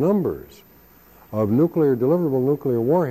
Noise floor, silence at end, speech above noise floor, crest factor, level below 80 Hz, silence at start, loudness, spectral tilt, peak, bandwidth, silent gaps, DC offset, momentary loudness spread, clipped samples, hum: -50 dBFS; 0 s; 31 dB; 12 dB; -56 dBFS; 0 s; -21 LUFS; -10.5 dB/octave; -8 dBFS; 15 kHz; none; under 0.1%; 9 LU; under 0.1%; none